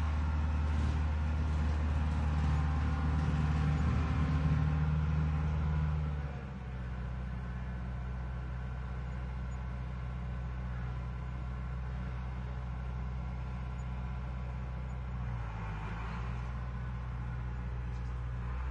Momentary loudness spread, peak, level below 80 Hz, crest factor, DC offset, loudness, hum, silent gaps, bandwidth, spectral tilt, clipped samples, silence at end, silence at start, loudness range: 9 LU; -20 dBFS; -38 dBFS; 14 dB; under 0.1%; -36 LUFS; none; none; 7.4 kHz; -8 dB/octave; under 0.1%; 0 s; 0 s; 8 LU